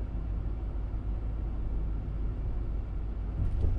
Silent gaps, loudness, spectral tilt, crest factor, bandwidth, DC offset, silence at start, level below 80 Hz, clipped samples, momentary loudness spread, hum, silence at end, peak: none; -36 LUFS; -10 dB/octave; 16 dB; 3.5 kHz; under 0.1%; 0 s; -32 dBFS; under 0.1%; 3 LU; none; 0 s; -16 dBFS